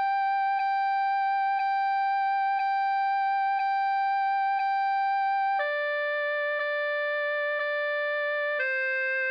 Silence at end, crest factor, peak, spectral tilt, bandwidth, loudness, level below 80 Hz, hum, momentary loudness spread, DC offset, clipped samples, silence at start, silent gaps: 0 s; 8 dB; -18 dBFS; 0.5 dB/octave; 5.8 kHz; -27 LUFS; -90 dBFS; none; 2 LU; under 0.1%; under 0.1%; 0 s; none